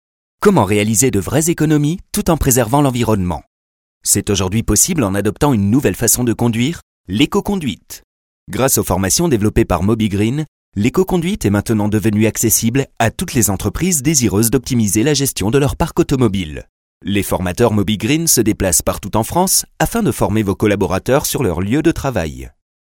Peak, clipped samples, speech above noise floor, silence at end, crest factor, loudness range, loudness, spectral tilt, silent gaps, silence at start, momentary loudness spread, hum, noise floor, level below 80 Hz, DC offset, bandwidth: 0 dBFS; under 0.1%; over 75 dB; 0.45 s; 16 dB; 2 LU; -15 LUFS; -4.5 dB/octave; 3.47-4.01 s, 6.83-7.04 s, 8.04-8.46 s, 10.48-10.72 s, 16.69-17.00 s; 0.4 s; 8 LU; none; under -90 dBFS; -34 dBFS; under 0.1%; 18.5 kHz